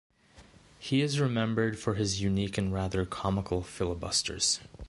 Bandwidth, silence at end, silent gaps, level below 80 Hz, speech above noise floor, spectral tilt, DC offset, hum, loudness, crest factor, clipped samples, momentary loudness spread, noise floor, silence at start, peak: 11.5 kHz; 0 s; none; -48 dBFS; 27 dB; -4.5 dB/octave; under 0.1%; none; -30 LUFS; 18 dB; under 0.1%; 5 LU; -57 dBFS; 0.35 s; -14 dBFS